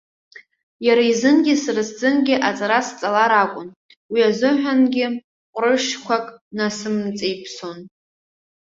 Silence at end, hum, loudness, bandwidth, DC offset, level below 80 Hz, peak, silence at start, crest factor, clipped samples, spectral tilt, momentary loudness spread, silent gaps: 0.8 s; none; -19 LUFS; 7.8 kHz; under 0.1%; -66 dBFS; -2 dBFS; 0.35 s; 18 dB; under 0.1%; -4 dB/octave; 16 LU; 0.63-0.80 s, 3.76-3.89 s, 3.96-4.09 s, 5.24-5.53 s, 6.41-6.51 s